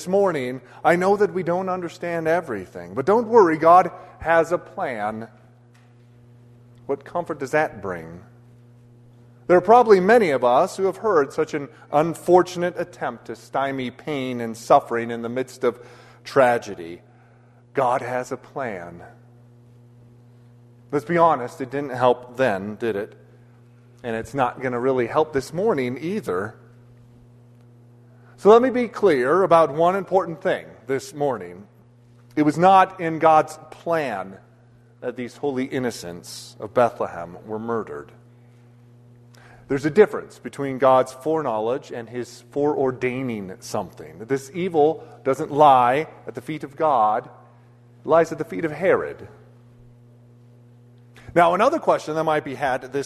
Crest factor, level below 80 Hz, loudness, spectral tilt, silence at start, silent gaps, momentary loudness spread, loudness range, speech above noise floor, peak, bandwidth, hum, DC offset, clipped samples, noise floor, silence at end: 20 dB; -60 dBFS; -21 LUFS; -6 dB/octave; 0 s; none; 17 LU; 9 LU; 31 dB; -2 dBFS; 13.5 kHz; none; under 0.1%; under 0.1%; -52 dBFS; 0 s